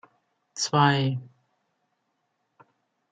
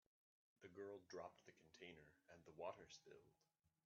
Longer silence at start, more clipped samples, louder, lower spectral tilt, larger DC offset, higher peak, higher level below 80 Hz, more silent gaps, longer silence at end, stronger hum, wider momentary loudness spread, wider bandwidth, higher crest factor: about the same, 0.55 s vs 0.6 s; neither; first, -24 LUFS vs -60 LUFS; first, -4.5 dB/octave vs -3 dB/octave; neither; first, -8 dBFS vs -40 dBFS; first, -72 dBFS vs under -90 dBFS; neither; first, 1.85 s vs 0.2 s; neither; first, 16 LU vs 13 LU; first, 9.2 kHz vs 7.2 kHz; about the same, 22 dB vs 22 dB